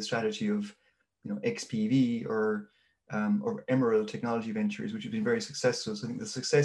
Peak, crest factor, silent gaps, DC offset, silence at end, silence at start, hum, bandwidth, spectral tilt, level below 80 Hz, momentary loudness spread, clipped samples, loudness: -12 dBFS; 18 dB; none; under 0.1%; 0 s; 0 s; none; 11.5 kHz; -5.5 dB/octave; -74 dBFS; 9 LU; under 0.1%; -31 LUFS